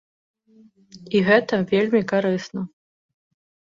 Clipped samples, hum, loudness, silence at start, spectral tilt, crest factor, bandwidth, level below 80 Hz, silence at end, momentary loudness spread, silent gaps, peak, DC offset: under 0.1%; none; -20 LUFS; 0.95 s; -6.5 dB/octave; 20 dB; 7.4 kHz; -64 dBFS; 1.1 s; 15 LU; none; -4 dBFS; under 0.1%